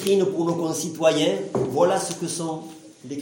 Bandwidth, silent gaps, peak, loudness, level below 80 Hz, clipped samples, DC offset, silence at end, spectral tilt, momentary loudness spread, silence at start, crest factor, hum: 17 kHz; none; -6 dBFS; -23 LUFS; -66 dBFS; under 0.1%; under 0.1%; 0 s; -4.5 dB/octave; 15 LU; 0 s; 18 dB; none